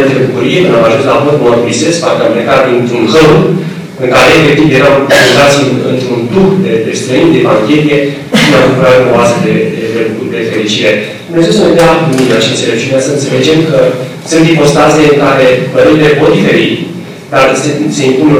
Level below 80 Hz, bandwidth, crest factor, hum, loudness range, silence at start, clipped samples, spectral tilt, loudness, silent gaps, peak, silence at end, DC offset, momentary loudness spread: -38 dBFS; 18.5 kHz; 6 dB; none; 2 LU; 0 s; under 0.1%; -5 dB/octave; -7 LUFS; none; 0 dBFS; 0 s; under 0.1%; 7 LU